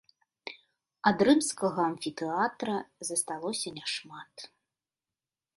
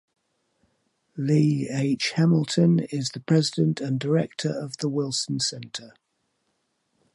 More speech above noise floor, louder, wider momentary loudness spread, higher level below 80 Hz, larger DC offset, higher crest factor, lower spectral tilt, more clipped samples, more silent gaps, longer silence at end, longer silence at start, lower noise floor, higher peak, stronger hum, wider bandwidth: first, over 60 dB vs 50 dB; second, -30 LUFS vs -24 LUFS; first, 21 LU vs 9 LU; about the same, -72 dBFS vs -68 dBFS; neither; first, 24 dB vs 18 dB; second, -3.5 dB/octave vs -5.5 dB/octave; neither; neither; second, 1.1 s vs 1.25 s; second, 0.45 s vs 1.15 s; first, under -90 dBFS vs -74 dBFS; about the same, -8 dBFS vs -8 dBFS; neither; about the same, 12 kHz vs 11.5 kHz